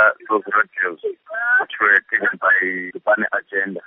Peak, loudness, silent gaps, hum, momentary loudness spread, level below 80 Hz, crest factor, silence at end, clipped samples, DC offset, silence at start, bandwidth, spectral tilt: -2 dBFS; -18 LUFS; none; none; 9 LU; -74 dBFS; 16 dB; 0.05 s; under 0.1%; under 0.1%; 0 s; 3.9 kHz; -1.5 dB/octave